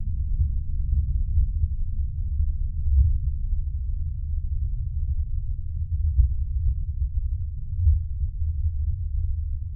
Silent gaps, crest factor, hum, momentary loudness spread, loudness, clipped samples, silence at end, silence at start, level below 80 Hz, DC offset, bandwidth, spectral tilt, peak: none; 16 dB; none; 7 LU; -28 LUFS; under 0.1%; 0 s; 0 s; -26 dBFS; under 0.1%; 0.3 kHz; -17.5 dB/octave; -8 dBFS